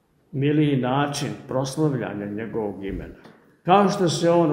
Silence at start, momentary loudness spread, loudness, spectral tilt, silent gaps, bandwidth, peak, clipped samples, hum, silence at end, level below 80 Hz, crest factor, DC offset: 0.35 s; 14 LU; -23 LUFS; -6 dB/octave; none; 16 kHz; -4 dBFS; under 0.1%; none; 0 s; -50 dBFS; 20 dB; under 0.1%